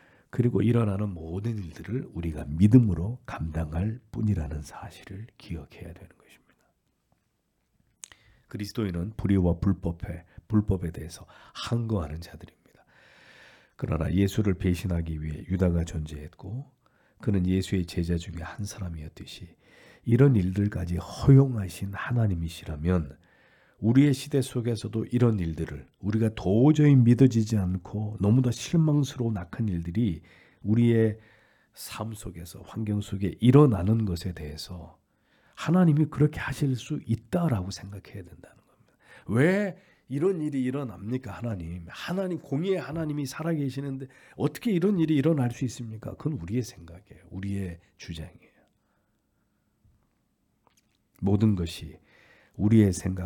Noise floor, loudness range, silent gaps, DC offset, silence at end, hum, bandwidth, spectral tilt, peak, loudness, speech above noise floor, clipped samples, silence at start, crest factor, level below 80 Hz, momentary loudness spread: -74 dBFS; 12 LU; none; under 0.1%; 0 s; none; 18 kHz; -7.5 dB/octave; -6 dBFS; -27 LUFS; 48 dB; under 0.1%; 0.35 s; 22 dB; -48 dBFS; 19 LU